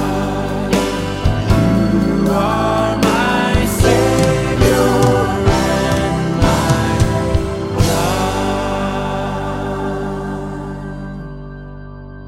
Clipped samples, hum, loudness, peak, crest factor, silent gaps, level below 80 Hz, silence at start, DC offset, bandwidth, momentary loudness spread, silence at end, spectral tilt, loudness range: under 0.1%; none; -16 LUFS; 0 dBFS; 14 dB; none; -26 dBFS; 0 s; under 0.1%; 16.5 kHz; 14 LU; 0 s; -6 dB/octave; 7 LU